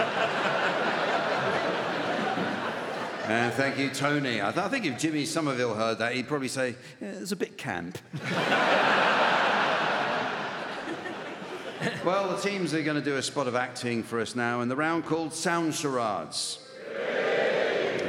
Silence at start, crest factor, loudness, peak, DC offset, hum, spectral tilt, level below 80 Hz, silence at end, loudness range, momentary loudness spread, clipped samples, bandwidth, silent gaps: 0 s; 18 dB; -28 LUFS; -10 dBFS; under 0.1%; none; -4 dB/octave; -76 dBFS; 0 s; 4 LU; 11 LU; under 0.1%; 17 kHz; none